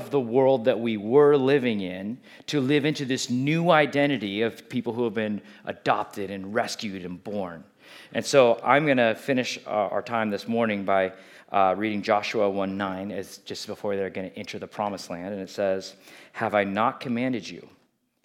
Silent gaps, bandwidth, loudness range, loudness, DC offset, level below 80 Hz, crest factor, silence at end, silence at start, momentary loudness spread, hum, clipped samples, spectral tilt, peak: none; 15.5 kHz; 7 LU; -25 LUFS; under 0.1%; -78 dBFS; 22 dB; 0.6 s; 0 s; 15 LU; none; under 0.1%; -5.5 dB/octave; -4 dBFS